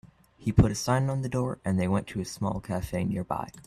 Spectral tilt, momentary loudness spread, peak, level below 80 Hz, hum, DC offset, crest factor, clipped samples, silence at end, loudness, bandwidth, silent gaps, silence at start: -6.5 dB/octave; 9 LU; -6 dBFS; -44 dBFS; none; under 0.1%; 22 dB; under 0.1%; 0.05 s; -28 LUFS; 14.5 kHz; none; 0.05 s